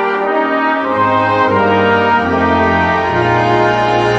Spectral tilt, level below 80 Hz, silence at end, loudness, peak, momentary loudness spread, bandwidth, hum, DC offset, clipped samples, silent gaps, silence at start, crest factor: -6.5 dB/octave; -40 dBFS; 0 s; -12 LUFS; 0 dBFS; 3 LU; 9.4 kHz; none; under 0.1%; under 0.1%; none; 0 s; 12 dB